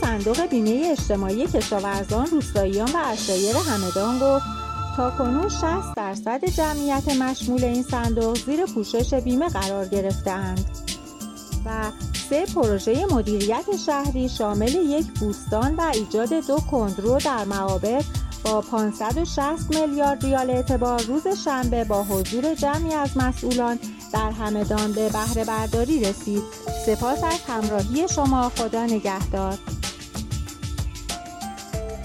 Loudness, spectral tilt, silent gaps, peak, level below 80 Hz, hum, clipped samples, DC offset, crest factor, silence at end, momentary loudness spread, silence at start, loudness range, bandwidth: -24 LUFS; -5 dB/octave; none; -10 dBFS; -34 dBFS; none; under 0.1%; under 0.1%; 14 dB; 0 s; 8 LU; 0 s; 2 LU; 16.5 kHz